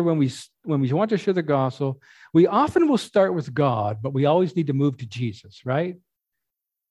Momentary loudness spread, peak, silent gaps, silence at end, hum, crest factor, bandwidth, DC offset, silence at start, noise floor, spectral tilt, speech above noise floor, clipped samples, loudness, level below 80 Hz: 11 LU; -6 dBFS; none; 0.95 s; none; 16 dB; 12 kHz; under 0.1%; 0 s; -84 dBFS; -7.5 dB/octave; 62 dB; under 0.1%; -22 LUFS; -60 dBFS